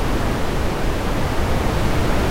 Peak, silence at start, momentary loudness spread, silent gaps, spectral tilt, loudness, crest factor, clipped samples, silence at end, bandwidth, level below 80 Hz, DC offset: -6 dBFS; 0 s; 2 LU; none; -5.5 dB/octave; -22 LUFS; 12 dB; under 0.1%; 0 s; 16 kHz; -22 dBFS; under 0.1%